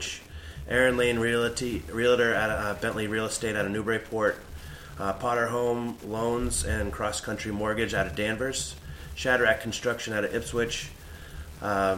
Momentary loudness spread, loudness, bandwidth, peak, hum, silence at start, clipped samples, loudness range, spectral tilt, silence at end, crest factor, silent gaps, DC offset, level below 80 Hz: 17 LU; -28 LUFS; 16.5 kHz; -8 dBFS; none; 0 s; under 0.1%; 3 LU; -4 dB/octave; 0 s; 20 dB; none; under 0.1%; -44 dBFS